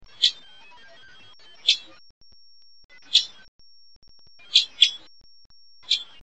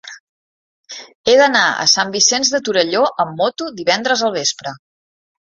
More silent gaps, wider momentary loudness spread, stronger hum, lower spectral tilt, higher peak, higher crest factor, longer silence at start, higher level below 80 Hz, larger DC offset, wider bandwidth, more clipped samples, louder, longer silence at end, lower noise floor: second, 2.10-2.21 s, 2.84-2.89 s, 3.48-3.59 s, 3.96-4.02 s, 5.46-5.50 s vs 0.20-0.84 s, 1.15-1.24 s; second, 12 LU vs 16 LU; neither; second, 3.5 dB/octave vs -1 dB/octave; about the same, -2 dBFS vs 0 dBFS; first, 26 dB vs 18 dB; first, 0.2 s vs 0.05 s; about the same, -66 dBFS vs -62 dBFS; first, 0.4% vs under 0.1%; first, 8.8 kHz vs 7.8 kHz; neither; second, -21 LUFS vs -15 LUFS; second, 0.2 s vs 0.75 s; second, -56 dBFS vs under -90 dBFS